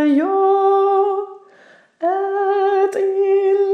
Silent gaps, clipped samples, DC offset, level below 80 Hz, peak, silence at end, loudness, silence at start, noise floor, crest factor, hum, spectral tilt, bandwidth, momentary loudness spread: none; under 0.1%; under 0.1%; under -90 dBFS; -6 dBFS; 0 s; -17 LUFS; 0 s; -49 dBFS; 10 dB; none; -5 dB/octave; 8.6 kHz; 7 LU